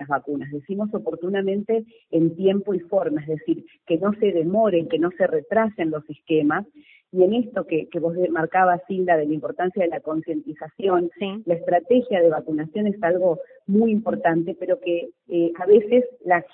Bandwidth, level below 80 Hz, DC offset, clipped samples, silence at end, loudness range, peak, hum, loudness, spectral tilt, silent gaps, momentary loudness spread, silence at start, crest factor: 3.8 kHz; -66 dBFS; under 0.1%; under 0.1%; 0.05 s; 2 LU; -4 dBFS; none; -22 LUFS; -11.5 dB/octave; none; 8 LU; 0 s; 18 dB